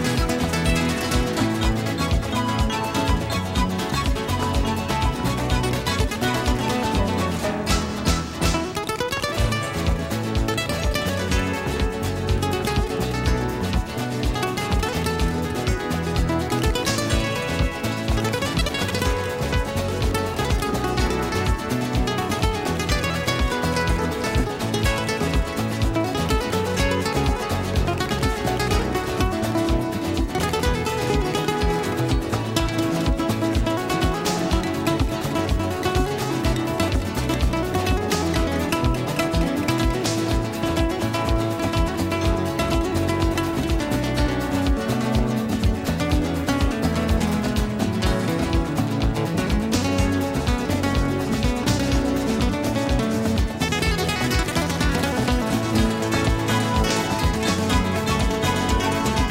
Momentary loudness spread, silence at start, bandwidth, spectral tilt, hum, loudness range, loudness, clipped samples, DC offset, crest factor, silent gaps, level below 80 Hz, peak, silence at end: 3 LU; 0 s; 16 kHz; -5 dB/octave; none; 2 LU; -23 LUFS; under 0.1%; under 0.1%; 16 dB; none; -28 dBFS; -6 dBFS; 0 s